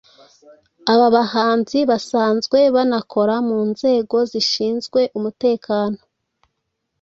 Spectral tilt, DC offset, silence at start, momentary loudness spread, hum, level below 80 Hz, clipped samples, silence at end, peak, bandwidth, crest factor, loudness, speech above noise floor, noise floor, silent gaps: -5 dB/octave; under 0.1%; 0.85 s; 6 LU; none; -62 dBFS; under 0.1%; 1.05 s; -2 dBFS; 8 kHz; 18 dB; -18 LUFS; 57 dB; -75 dBFS; none